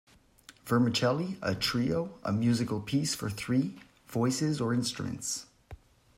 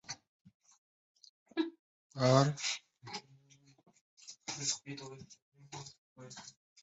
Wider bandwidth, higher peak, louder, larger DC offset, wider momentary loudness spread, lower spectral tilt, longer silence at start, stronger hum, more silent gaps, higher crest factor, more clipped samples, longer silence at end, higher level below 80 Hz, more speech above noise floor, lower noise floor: first, 16 kHz vs 8 kHz; about the same, -14 dBFS vs -14 dBFS; first, -30 LUFS vs -35 LUFS; neither; second, 8 LU vs 25 LU; about the same, -5 dB/octave vs -5 dB/octave; first, 0.5 s vs 0.1 s; neither; second, none vs 0.28-0.45 s, 0.54-0.60 s, 0.78-1.15 s, 1.29-1.46 s, 1.79-2.10 s, 4.01-4.17 s, 5.42-5.52 s, 5.98-6.16 s; second, 16 dB vs 24 dB; neither; first, 0.45 s vs 0.3 s; first, -60 dBFS vs -76 dBFS; about the same, 28 dB vs 31 dB; second, -58 dBFS vs -65 dBFS